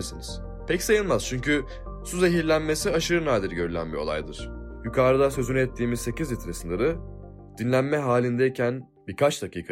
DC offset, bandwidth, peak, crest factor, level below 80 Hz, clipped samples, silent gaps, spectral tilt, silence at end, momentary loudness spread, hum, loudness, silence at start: under 0.1%; 16 kHz; -10 dBFS; 16 dB; -40 dBFS; under 0.1%; none; -5 dB/octave; 0 s; 14 LU; none; -25 LUFS; 0 s